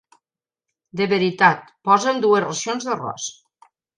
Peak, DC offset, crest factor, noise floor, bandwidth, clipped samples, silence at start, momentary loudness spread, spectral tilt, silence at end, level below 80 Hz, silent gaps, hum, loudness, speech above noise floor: -2 dBFS; under 0.1%; 20 dB; -89 dBFS; 10.5 kHz; under 0.1%; 0.95 s; 13 LU; -4 dB/octave; 0.65 s; -70 dBFS; none; none; -20 LUFS; 70 dB